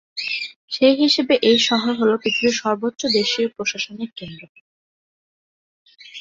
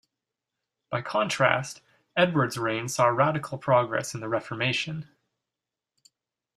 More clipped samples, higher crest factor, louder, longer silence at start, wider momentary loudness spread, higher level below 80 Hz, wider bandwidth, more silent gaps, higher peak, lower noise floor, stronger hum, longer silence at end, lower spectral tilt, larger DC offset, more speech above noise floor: neither; second, 18 dB vs 24 dB; first, -19 LUFS vs -26 LUFS; second, 0.15 s vs 0.9 s; first, 15 LU vs 11 LU; first, -62 dBFS vs -68 dBFS; second, 7.8 kHz vs 15 kHz; first, 0.56-0.68 s, 4.49-4.55 s, 4.61-5.85 s vs none; about the same, -2 dBFS vs -4 dBFS; about the same, under -90 dBFS vs -88 dBFS; neither; second, 0 s vs 1.55 s; second, -3 dB/octave vs -4.5 dB/octave; neither; first, over 71 dB vs 63 dB